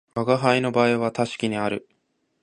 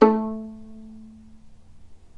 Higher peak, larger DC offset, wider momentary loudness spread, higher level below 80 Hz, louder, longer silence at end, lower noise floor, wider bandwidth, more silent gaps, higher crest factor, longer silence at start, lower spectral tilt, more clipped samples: about the same, -2 dBFS vs -2 dBFS; neither; second, 7 LU vs 24 LU; second, -64 dBFS vs -54 dBFS; first, -22 LUFS vs -25 LUFS; first, 0.65 s vs 0.2 s; first, -71 dBFS vs -45 dBFS; first, 10.5 kHz vs 6.4 kHz; neither; about the same, 22 dB vs 24 dB; first, 0.15 s vs 0 s; second, -6 dB/octave vs -8 dB/octave; neither